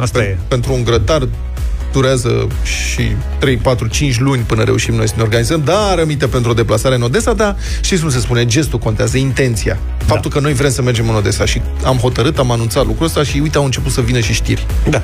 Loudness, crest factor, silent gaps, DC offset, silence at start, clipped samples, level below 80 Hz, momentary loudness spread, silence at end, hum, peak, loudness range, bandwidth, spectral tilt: -14 LUFS; 12 dB; none; under 0.1%; 0 s; under 0.1%; -22 dBFS; 4 LU; 0 s; none; -2 dBFS; 2 LU; 16 kHz; -5 dB/octave